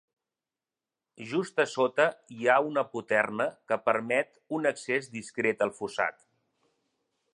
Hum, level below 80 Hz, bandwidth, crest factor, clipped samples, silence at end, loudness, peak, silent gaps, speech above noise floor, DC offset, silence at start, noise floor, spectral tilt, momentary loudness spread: none; -78 dBFS; 11 kHz; 22 dB; under 0.1%; 1.2 s; -29 LUFS; -8 dBFS; none; over 61 dB; under 0.1%; 1.2 s; under -90 dBFS; -4.5 dB/octave; 7 LU